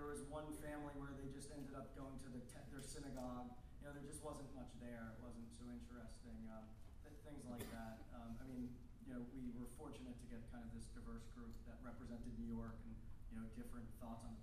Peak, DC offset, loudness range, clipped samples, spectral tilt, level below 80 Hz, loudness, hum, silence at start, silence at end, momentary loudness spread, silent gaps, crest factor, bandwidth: -36 dBFS; under 0.1%; 3 LU; under 0.1%; -6 dB/octave; -60 dBFS; -55 LUFS; none; 0 s; 0 s; 7 LU; none; 16 dB; 15.5 kHz